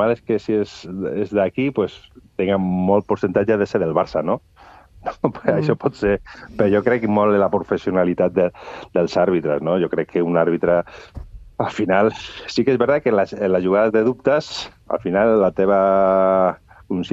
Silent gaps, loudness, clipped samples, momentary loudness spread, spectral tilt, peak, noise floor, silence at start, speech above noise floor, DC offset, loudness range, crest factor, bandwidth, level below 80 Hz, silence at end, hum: none; -19 LUFS; under 0.1%; 11 LU; -7.5 dB/octave; 0 dBFS; -46 dBFS; 0 s; 27 dB; under 0.1%; 3 LU; 18 dB; 8 kHz; -48 dBFS; 0 s; none